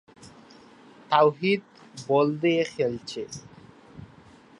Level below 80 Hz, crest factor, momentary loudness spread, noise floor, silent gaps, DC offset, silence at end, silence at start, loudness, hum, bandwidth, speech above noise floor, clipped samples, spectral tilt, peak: -66 dBFS; 22 dB; 22 LU; -52 dBFS; none; under 0.1%; 0.55 s; 0.2 s; -25 LUFS; none; 11 kHz; 28 dB; under 0.1%; -5.5 dB/octave; -6 dBFS